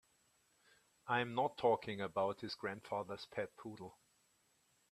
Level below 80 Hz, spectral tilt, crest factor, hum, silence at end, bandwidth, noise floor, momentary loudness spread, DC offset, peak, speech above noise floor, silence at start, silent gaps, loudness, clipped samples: -80 dBFS; -5.5 dB/octave; 22 dB; none; 1 s; 13.5 kHz; -77 dBFS; 16 LU; under 0.1%; -20 dBFS; 37 dB; 1.05 s; none; -40 LUFS; under 0.1%